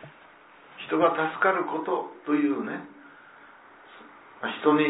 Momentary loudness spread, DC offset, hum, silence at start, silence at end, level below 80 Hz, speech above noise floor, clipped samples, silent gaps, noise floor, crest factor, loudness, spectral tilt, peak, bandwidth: 24 LU; under 0.1%; none; 0 s; 0 s; -80 dBFS; 27 dB; under 0.1%; none; -53 dBFS; 20 dB; -27 LUFS; -9 dB/octave; -8 dBFS; 4 kHz